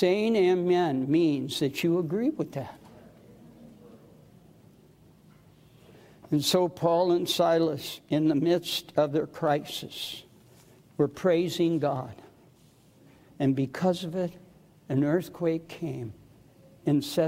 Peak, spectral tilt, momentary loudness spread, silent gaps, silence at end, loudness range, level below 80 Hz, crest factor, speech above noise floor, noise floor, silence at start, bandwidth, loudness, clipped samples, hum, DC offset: -10 dBFS; -6 dB/octave; 12 LU; none; 0 s; 7 LU; -68 dBFS; 18 dB; 32 dB; -58 dBFS; 0 s; 16 kHz; -27 LUFS; under 0.1%; none; under 0.1%